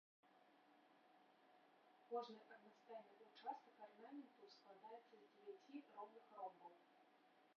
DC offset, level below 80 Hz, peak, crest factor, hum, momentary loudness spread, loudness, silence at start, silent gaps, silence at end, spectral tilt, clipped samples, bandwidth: under 0.1%; under -90 dBFS; -38 dBFS; 22 dB; none; 14 LU; -59 LUFS; 0.25 s; none; 0.05 s; -2.5 dB/octave; under 0.1%; 6.4 kHz